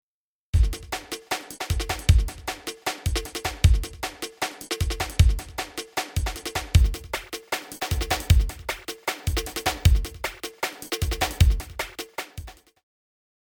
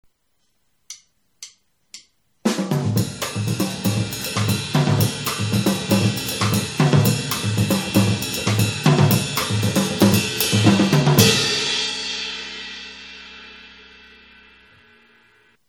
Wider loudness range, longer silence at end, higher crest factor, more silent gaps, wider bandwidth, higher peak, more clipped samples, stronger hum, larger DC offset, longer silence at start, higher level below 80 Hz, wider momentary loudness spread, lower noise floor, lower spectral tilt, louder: second, 1 LU vs 10 LU; second, 1.1 s vs 1.95 s; about the same, 20 dB vs 20 dB; neither; about the same, over 20 kHz vs 18.5 kHz; second, -6 dBFS vs 0 dBFS; neither; neither; neither; second, 0.55 s vs 0.9 s; first, -28 dBFS vs -52 dBFS; second, 11 LU vs 21 LU; first, under -90 dBFS vs -70 dBFS; about the same, -4 dB/octave vs -4.5 dB/octave; second, -26 LUFS vs -19 LUFS